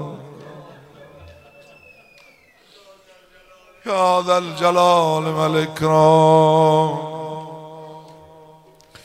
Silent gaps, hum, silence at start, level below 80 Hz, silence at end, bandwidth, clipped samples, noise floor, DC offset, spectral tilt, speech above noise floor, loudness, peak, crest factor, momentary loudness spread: none; none; 0 s; -60 dBFS; 1.05 s; 15 kHz; under 0.1%; -52 dBFS; under 0.1%; -6 dB/octave; 36 dB; -16 LUFS; -2 dBFS; 18 dB; 25 LU